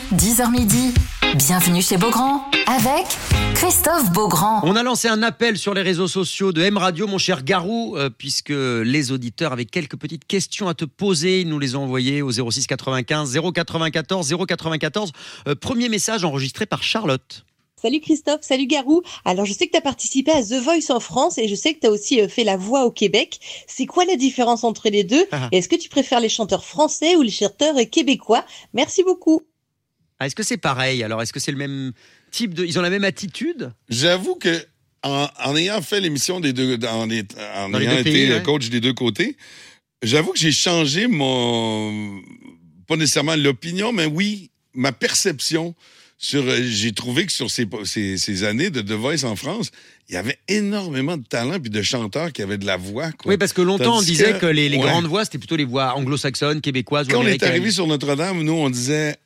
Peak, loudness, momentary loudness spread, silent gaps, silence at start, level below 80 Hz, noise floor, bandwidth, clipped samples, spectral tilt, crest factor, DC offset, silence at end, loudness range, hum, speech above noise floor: -2 dBFS; -19 LUFS; 9 LU; none; 0 s; -42 dBFS; -74 dBFS; 16.5 kHz; under 0.1%; -4 dB/octave; 18 dB; under 0.1%; 0.1 s; 5 LU; none; 54 dB